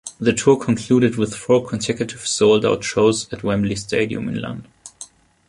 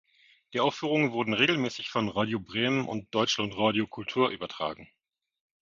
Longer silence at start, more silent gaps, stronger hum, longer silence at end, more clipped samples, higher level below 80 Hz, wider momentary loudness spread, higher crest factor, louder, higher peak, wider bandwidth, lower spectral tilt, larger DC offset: second, 0.05 s vs 0.5 s; neither; neither; second, 0.45 s vs 0.75 s; neither; first, -50 dBFS vs -64 dBFS; first, 16 LU vs 9 LU; about the same, 18 dB vs 22 dB; first, -19 LUFS vs -28 LUFS; first, -2 dBFS vs -8 dBFS; first, 11.5 kHz vs 7.6 kHz; about the same, -5 dB/octave vs -4.5 dB/octave; neither